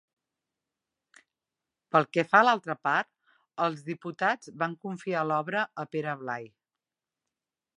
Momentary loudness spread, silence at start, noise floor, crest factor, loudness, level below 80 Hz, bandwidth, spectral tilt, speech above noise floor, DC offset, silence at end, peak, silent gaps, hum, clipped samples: 15 LU; 1.95 s; under -90 dBFS; 26 dB; -28 LUFS; -84 dBFS; 11 kHz; -5.5 dB/octave; over 62 dB; under 0.1%; 1.3 s; -6 dBFS; none; none; under 0.1%